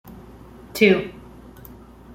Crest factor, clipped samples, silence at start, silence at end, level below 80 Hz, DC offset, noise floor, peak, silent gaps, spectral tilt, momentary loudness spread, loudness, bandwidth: 22 dB; under 0.1%; 0.05 s; 1.05 s; -50 dBFS; under 0.1%; -43 dBFS; -2 dBFS; none; -5.5 dB/octave; 26 LU; -18 LUFS; 16.5 kHz